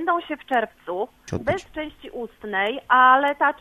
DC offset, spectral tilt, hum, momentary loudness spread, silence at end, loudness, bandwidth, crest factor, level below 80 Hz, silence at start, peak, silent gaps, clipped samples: under 0.1%; -5 dB/octave; none; 18 LU; 0.05 s; -21 LUFS; 13.5 kHz; 20 dB; -54 dBFS; 0 s; -2 dBFS; none; under 0.1%